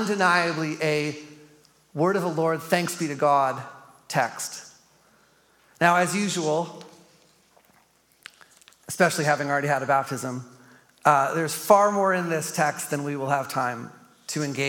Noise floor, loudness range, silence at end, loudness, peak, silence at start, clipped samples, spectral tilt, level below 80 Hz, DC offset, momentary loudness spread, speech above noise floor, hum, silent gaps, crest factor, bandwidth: -62 dBFS; 4 LU; 0 s; -24 LUFS; -4 dBFS; 0 s; under 0.1%; -4.5 dB/octave; -76 dBFS; under 0.1%; 16 LU; 38 dB; none; none; 22 dB; 17.5 kHz